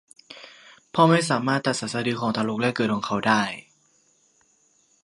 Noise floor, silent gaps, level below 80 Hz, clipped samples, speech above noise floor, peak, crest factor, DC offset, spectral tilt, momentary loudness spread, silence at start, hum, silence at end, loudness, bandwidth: -63 dBFS; none; -66 dBFS; under 0.1%; 41 dB; -4 dBFS; 22 dB; under 0.1%; -5 dB/octave; 24 LU; 0.3 s; none; 1.45 s; -23 LUFS; 11.5 kHz